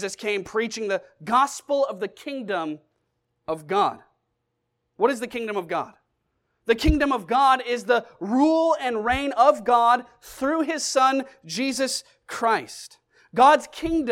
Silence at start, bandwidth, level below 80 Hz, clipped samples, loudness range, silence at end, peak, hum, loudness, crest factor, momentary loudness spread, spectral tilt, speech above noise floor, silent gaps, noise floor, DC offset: 0 s; 16.5 kHz; -42 dBFS; under 0.1%; 7 LU; 0 s; -4 dBFS; none; -23 LUFS; 20 dB; 14 LU; -4 dB/octave; 54 dB; none; -77 dBFS; under 0.1%